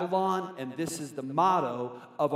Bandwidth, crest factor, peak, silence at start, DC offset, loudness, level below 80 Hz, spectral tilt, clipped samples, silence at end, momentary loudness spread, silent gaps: 16 kHz; 16 dB; -12 dBFS; 0 s; under 0.1%; -30 LUFS; -80 dBFS; -5.5 dB/octave; under 0.1%; 0 s; 11 LU; none